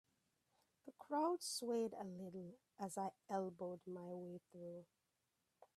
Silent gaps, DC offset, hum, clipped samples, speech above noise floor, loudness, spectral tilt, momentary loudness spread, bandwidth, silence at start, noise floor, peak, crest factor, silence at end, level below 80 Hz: none; under 0.1%; none; under 0.1%; 41 dB; -47 LUFS; -4.5 dB/octave; 17 LU; 15 kHz; 0.85 s; -88 dBFS; -30 dBFS; 18 dB; 0.1 s; under -90 dBFS